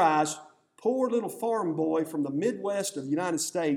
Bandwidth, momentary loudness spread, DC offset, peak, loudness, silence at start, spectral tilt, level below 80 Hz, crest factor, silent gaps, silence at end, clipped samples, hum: 17 kHz; 4 LU; under 0.1%; -10 dBFS; -29 LUFS; 0 s; -4.5 dB/octave; -82 dBFS; 18 dB; none; 0 s; under 0.1%; none